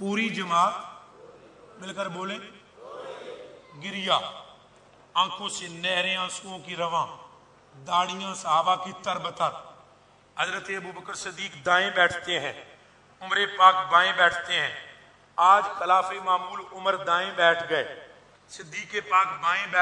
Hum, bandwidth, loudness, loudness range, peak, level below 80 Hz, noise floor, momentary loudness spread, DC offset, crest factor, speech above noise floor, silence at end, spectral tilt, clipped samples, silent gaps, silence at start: none; 11 kHz; -25 LUFS; 9 LU; -4 dBFS; -72 dBFS; -57 dBFS; 20 LU; under 0.1%; 22 dB; 32 dB; 0 s; -2.5 dB/octave; under 0.1%; none; 0 s